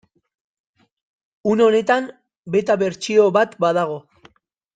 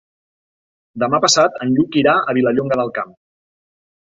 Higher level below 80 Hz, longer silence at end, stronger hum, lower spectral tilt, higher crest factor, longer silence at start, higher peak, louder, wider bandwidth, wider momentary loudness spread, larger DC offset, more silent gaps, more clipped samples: second, -66 dBFS vs -58 dBFS; second, 0.75 s vs 1.1 s; neither; first, -5.5 dB/octave vs -4 dB/octave; about the same, 16 dB vs 18 dB; first, 1.45 s vs 0.95 s; about the same, -4 dBFS vs -2 dBFS; about the same, -18 LUFS vs -16 LUFS; first, 9.2 kHz vs 8.2 kHz; about the same, 11 LU vs 10 LU; neither; first, 2.37-2.43 s vs none; neither